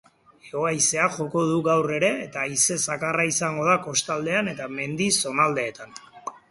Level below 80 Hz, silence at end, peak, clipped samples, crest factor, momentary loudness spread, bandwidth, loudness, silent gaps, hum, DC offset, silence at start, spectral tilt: -64 dBFS; 0.15 s; -6 dBFS; under 0.1%; 18 dB; 11 LU; 12 kHz; -23 LUFS; none; none; under 0.1%; 0.45 s; -3 dB/octave